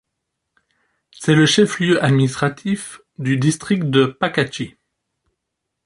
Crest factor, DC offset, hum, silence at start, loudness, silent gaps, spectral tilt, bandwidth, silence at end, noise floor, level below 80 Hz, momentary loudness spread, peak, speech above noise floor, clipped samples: 18 dB; under 0.1%; none; 1.2 s; -18 LUFS; none; -5.5 dB/octave; 11.5 kHz; 1.15 s; -78 dBFS; -56 dBFS; 12 LU; -2 dBFS; 62 dB; under 0.1%